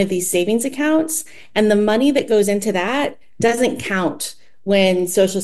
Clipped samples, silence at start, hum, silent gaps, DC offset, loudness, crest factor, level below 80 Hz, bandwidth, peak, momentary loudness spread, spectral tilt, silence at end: under 0.1%; 0 s; none; none; 1%; -18 LUFS; 16 dB; -54 dBFS; 13 kHz; -2 dBFS; 8 LU; -4 dB/octave; 0 s